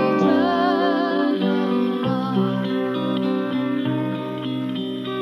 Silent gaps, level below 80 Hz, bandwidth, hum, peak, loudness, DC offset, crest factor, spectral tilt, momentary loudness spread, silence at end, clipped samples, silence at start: none; -70 dBFS; 6.6 kHz; none; -6 dBFS; -22 LUFS; under 0.1%; 14 dB; -8 dB/octave; 8 LU; 0 s; under 0.1%; 0 s